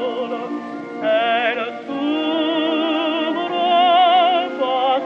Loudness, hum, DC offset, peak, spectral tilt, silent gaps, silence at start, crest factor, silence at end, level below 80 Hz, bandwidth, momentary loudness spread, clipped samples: -18 LUFS; none; under 0.1%; -6 dBFS; -5 dB/octave; none; 0 s; 14 dB; 0 s; -76 dBFS; 6.8 kHz; 12 LU; under 0.1%